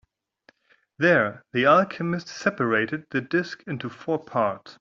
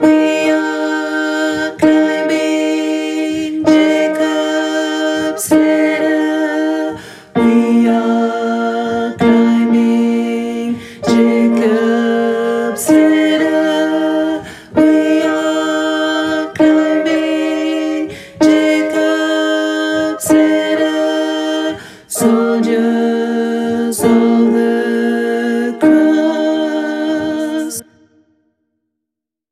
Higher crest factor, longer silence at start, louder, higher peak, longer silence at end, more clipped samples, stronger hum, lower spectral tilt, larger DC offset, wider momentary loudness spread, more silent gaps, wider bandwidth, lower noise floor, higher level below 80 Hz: first, 20 dB vs 12 dB; first, 1 s vs 0 s; second, -24 LUFS vs -14 LUFS; second, -6 dBFS vs 0 dBFS; second, 0.1 s vs 1.7 s; neither; neither; first, -6 dB/octave vs -4.5 dB/octave; neither; first, 12 LU vs 7 LU; neither; second, 7.6 kHz vs 15 kHz; second, -62 dBFS vs -81 dBFS; second, -66 dBFS vs -56 dBFS